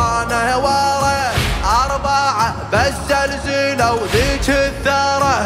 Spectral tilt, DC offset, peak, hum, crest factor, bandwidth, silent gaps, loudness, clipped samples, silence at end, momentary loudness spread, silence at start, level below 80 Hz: -4 dB/octave; under 0.1%; -4 dBFS; none; 12 dB; 16 kHz; none; -16 LUFS; under 0.1%; 0 s; 2 LU; 0 s; -28 dBFS